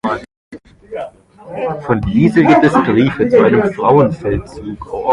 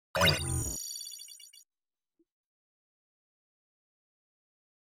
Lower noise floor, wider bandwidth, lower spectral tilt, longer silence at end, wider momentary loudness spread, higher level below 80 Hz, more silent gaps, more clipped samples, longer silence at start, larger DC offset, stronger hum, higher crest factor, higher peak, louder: second, -34 dBFS vs under -90 dBFS; second, 11 kHz vs 17 kHz; first, -8 dB/octave vs -2.5 dB/octave; second, 0 s vs 3.3 s; second, 18 LU vs 21 LU; first, -36 dBFS vs -52 dBFS; first, 0.37-0.51 s vs none; neither; about the same, 0.05 s vs 0.15 s; neither; neither; second, 14 dB vs 24 dB; first, 0 dBFS vs -12 dBFS; first, -13 LUFS vs -31 LUFS